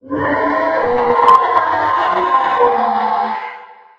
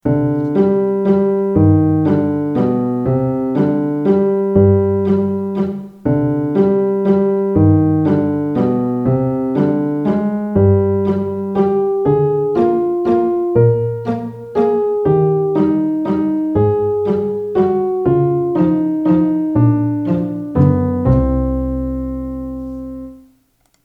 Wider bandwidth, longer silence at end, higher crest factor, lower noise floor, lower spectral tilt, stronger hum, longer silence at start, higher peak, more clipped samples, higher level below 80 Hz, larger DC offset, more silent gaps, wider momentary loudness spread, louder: first, 8.2 kHz vs 5 kHz; second, 0.25 s vs 0.65 s; about the same, 14 dB vs 14 dB; second, -35 dBFS vs -59 dBFS; second, -5.5 dB/octave vs -11.5 dB/octave; neither; about the same, 0.05 s vs 0.05 s; about the same, 0 dBFS vs 0 dBFS; neither; second, -50 dBFS vs -34 dBFS; neither; neither; about the same, 8 LU vs 7 LU; about the same, -14 LUFS vs -15 LUFS